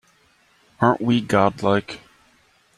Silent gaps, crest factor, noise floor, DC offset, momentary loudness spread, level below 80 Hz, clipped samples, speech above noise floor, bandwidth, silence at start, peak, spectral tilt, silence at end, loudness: none; 20 dB; -59 dBFS; under 0.1%; 14 LU; -58 dBFS; under 0.1%; 40 dB; 12.5 kHz; 0.8 s; -2 dBFS; -6.5 dB/octave; 0.8 s; -20 LUFS